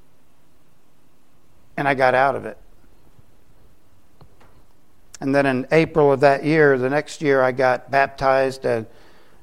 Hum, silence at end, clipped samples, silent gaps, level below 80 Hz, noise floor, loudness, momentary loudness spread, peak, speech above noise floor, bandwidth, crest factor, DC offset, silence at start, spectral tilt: none; 0.55 s; under 0.1%; none; -54 dBFS; -60 dBFS; -19 LUFS; 11 LU; -2 dBFS; 42 dB; 12.5 kHz; 20 dB; 0.8%; 1.75 s; -6.5 dB/octave